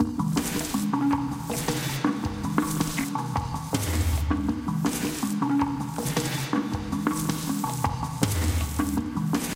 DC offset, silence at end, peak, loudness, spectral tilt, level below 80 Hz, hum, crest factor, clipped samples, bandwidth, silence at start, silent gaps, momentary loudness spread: under 0.1%; 0 s; -6 dBFS; -27 LUFS; -5 dB/octave; -38 dBFS; none; 20 dB; under 0.1%; 17 kHz; 0 s; none; 4 LU